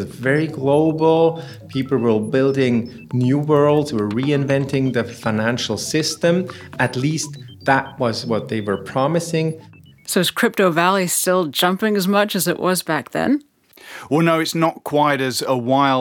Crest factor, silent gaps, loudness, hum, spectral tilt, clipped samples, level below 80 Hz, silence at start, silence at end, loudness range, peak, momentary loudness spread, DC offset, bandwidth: 18 dB; none; -19 LUFS; none; -5 dB/octave; under 0.1%; -62 dBFS; 0 s; 0 s; 3 LU; -2 dBFS; 7 LU; under 0.1%; 18 kHz